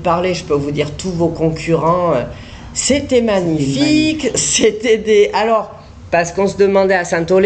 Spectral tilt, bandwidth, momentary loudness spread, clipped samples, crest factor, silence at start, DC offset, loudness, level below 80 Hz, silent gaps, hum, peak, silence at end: -4.5 dB/octave; 9.4 kHz; 7 LU; under 0.1%; 12 dB; 0 s; under 0.1%; -15 LUFS; -40 dBFS; none; none; -2 dBFS; 0 s